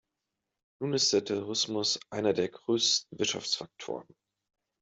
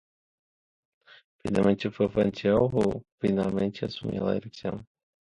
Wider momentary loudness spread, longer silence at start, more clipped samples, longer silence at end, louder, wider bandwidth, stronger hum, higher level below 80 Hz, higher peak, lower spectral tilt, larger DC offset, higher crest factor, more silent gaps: about the same, 13 LU vs 11 LU; second, 0.8 s vs 1.45 s; neither; first, 0.8 s vs 0.4 s; about the same, -29 LUFS vs -27 LUFS; second, 8.2 kHz vs 11 kHz; neither; second, -74 dBFS vs -54 dBFS; second, -12 dBFS vs -8 dBFS; second, -2.5 dB/octave vs -8 dB/octave; neither; about the same, 20 dB vs 20 dB; second, none vs 3.12-3.18 s